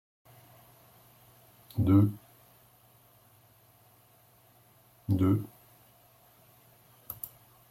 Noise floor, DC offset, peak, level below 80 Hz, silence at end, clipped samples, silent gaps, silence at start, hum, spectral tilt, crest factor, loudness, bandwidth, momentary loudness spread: -62 dBFS; under 0.1%; -12 dBFS; -64 dBFS; 0.45 s; under 0.1%; none; 1.75 s; none; -9 dB/octave; 22 dB; -29 LUFS; 16.5 kHz; 21 LU